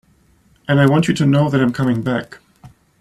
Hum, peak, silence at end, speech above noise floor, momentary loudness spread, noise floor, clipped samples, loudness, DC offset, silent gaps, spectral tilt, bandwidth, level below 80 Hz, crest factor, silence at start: none; -2 dBFS; 0.35 s; 40 dB; 11 LU; -55 dBFS; under 0.1%; -16 LUFS; under 0.1%; none; -7 dB/octave; 12 kHz; -50 dBFS; 16 dB; 0.7 s